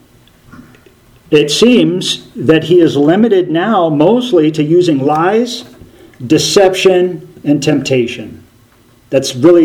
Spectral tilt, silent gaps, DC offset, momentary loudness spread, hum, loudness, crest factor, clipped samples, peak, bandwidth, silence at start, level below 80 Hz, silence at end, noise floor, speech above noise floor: -5 dB/octave; none; under 0.1%; 9 LU; none; -11 LUFS; 12 dB; 0.3%; 0 dBFS; 16 kHz; 0.6 s; -50 dBFS; 0 s; -46 dBFS; 36 dB